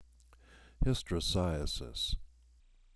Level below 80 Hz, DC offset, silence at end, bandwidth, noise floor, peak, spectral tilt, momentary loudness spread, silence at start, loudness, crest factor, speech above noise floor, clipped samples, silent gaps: -42 dBFS; under 0.1%; 0.7 s; 11 kHz; -63 dBFS; -18 dBFS; -5 dB/octave; 6 LU; 0 s; -35 LUFS; 20 dB; 28 dB; under 0.1%; none